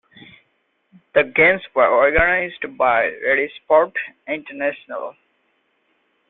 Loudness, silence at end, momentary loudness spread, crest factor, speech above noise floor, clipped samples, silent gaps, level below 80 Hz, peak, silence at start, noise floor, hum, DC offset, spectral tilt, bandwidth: -18 LUFS; 1.2 s; 14 LU; 18 dB; 49 dB; under 0.1%; none; -44 dBFS; -2 dBFS; 1.15 s; -67 dBFS; none; under 0.1%; -9 dB/octave; 4.1 kHz